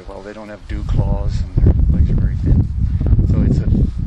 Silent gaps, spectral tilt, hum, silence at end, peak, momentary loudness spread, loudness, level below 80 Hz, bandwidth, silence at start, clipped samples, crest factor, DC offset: none; -9.5 dB/octave; none; 0 s; -2 dBFS; 15 LU; -17 LUFS; -18 dBFS; 7.6 kHz; 0 s; under 0.1%; 14 dB; under 0.1%